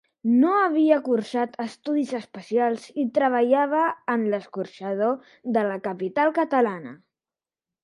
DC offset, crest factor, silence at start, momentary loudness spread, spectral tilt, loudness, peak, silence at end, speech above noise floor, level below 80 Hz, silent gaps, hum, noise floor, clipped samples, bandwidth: under 0.1%; 18 dB; 0.25 s; 11 LU; -6.5 dB/octave; -24 LUFS; -6 dBFS; 0.9 s; over 67 dB; -76 dBFS; none; none; under -90 dBFS; under 0.1%; 11 kHz